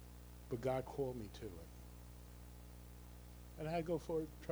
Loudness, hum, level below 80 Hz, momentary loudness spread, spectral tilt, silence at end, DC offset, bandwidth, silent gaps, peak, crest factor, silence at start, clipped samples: -44 LUFS; 60 Hz at -55 dBFS; -58 dBFS; 16 LU; -6.5 dB/octave; 0 s; under 0.1%; over 20 kHz; none; -26 dBFS; 18 dB; 0 s; under 0.1%